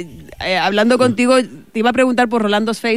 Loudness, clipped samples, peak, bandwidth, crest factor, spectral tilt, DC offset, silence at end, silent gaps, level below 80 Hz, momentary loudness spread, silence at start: -15 LUFS; under 0.1%; -2 dBFS; 15 kHz; 12 dB; -4.5 dB/octave; 0.6%; 0 s; none; -50 dBFS; 9 LU; 0 s